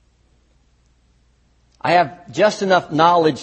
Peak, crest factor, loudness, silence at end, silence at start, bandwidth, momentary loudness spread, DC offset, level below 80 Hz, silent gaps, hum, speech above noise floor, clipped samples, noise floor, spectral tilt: 0 dBFS; 18 dB; -17 LUFS; 0 s; 1.85 s; 8.4 kHz; 7 LU; under 0.1%; -58 dBFS; none; none; 42 dB; under 0.1%; -58 dBFS; -5 dB/octave